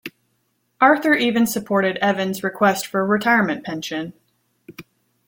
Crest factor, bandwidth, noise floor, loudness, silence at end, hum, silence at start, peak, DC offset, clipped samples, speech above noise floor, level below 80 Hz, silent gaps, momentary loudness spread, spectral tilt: 20 dB; 17 kHz; -68 dBFS; -19 LUFS; 0.45 s; none; 0.05 s; -2 dBFS; under 0.1%; under 0.1%; 50 dB; -64 dBFS; none; 11 LU; -4.5 dB/octave